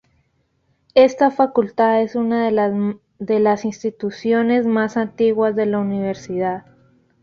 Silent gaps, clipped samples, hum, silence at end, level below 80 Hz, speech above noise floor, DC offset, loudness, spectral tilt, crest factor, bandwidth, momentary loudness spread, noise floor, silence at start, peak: none; under 0.1%; none; 0.65 s; -60 dBFS; 47 dB; under 0.1%; -18 LUFS; -6.5 dB/octave; 16 dB; 7.2 kHz; 10 LU; -65 dBFS; 0.95 s; -2 dBFS